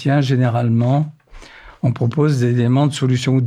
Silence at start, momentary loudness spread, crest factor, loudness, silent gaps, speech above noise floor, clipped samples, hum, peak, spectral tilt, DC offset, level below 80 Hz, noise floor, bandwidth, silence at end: 0 s; 5 LU; 12 dB; -17 LUFS; none; 25 dB; under 0.1%; none; -4 dBFS; -7.5 dB/octave; under 0.1%; -50 dBFS; -40 dBFS; 10 kHz; 0 s